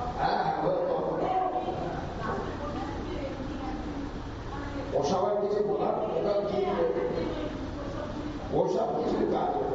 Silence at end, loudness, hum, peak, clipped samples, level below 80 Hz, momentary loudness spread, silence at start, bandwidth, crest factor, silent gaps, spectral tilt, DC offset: 0 s; -30 LUFS; none; -12 dBFS; under 0.1%; -46 dBFS; 8 LU; 0 s; 7.6 kHz; 16 dB; none; -5.5 dB/octave; under 0.1%